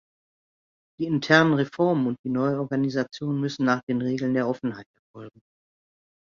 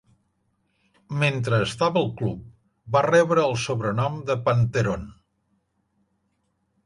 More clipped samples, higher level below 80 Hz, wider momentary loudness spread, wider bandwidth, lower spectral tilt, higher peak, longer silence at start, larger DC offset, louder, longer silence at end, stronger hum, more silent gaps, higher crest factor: neither; second, -66 dBFS vs -52 dBFS; first, 14 LU vs 11 LU; second, 7.4 kHz vs 11.5 kHz; about the same, -6.5 dB/octave vs -6 dB/octave; first, -2 dBFS vs -6 dBFS; about the same, 1 s vs 1.1 s; neither; about the same, -24 LUFS vs -23 LUFS; second, 1.05 s vs 1.7 s; neither; first, 2.19-2.24 s, 3.83-3.87 s, 4.86-5.14 s vs none; about the same, 24 dB vs 20 dB